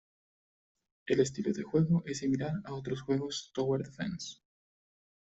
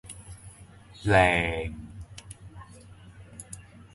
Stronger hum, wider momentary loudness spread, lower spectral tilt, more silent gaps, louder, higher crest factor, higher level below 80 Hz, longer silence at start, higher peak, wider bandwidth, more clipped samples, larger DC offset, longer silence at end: neither; second, 9 LU vs 26 LU; about the same, -6 dB/octave vs -5 dB/octave; neither; second, -33 LUFS vs -24 LUFS; about the same, 20 dB vs 24 dB; second, -64 dBFS vs -46 dBFS; first, 1.05 s vs 0.05 s; second, -14 dBFS vs -6 dBFS; second, 8 kHz vs 11.5 kHz; neither; neither; first, 1 s vs 0.35 s